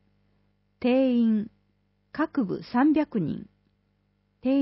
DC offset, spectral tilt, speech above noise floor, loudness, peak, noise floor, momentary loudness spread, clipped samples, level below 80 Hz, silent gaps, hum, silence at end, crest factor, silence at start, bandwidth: under 0.1%; -11 dB/octave; 46 dB; -26 LUFS; -12 dBFS; -70 dBFS; 12 LU; under 0.1%; -64 dBFS; none; 50 Hz at -55 dBFS; 0 s; 14 dB; 0.8 s; 5.8 kHz